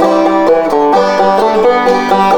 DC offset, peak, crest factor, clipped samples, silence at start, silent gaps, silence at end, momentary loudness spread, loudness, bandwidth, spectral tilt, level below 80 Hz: under 0.1%; 0 dBFS; 8 dB; under 0.1%; 0 s; none; 0 s; 1 LU; -10 LUFS; 19.5 kHz; -5.5 dB/octave; -42 dBFS